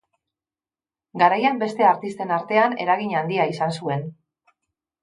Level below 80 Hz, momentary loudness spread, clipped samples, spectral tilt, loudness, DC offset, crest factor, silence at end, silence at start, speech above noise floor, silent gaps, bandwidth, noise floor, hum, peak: -74 dBFS; 9 LU; under 0.1%; -6.5 dB/octave; -21 LUFS; under 0.1%; 20 dB; 0.9 s; 1.15 s; over 69 dB; none; 11.5 kHz; under -90 dBFS; none; -2 dBFS